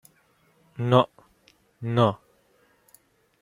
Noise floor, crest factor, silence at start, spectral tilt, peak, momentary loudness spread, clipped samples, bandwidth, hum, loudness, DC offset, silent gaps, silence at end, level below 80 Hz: -64 dBFS; 24 dB; 0.8 s; -8 dB/octave; -4 dBFS; 20 LU; under 0.1%; 15.5 kHz; none; -24 LUFS; under 0.1%; none; 1.25 s; -66 dBFS